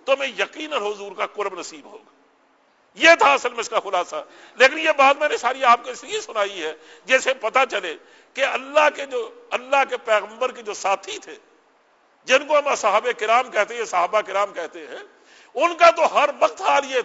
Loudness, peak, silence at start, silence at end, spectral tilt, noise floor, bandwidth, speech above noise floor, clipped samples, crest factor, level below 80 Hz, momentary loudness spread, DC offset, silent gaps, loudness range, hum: -20 LUFS; 0 dBFS; 0.05 s; 0 s; -1 dB/octave; -59 dBFS; 8 kHz; 39 dB; under 0.1%; 20 dB; -72 dBFS; 17 LU; under 0.1%; none; 5 LU; none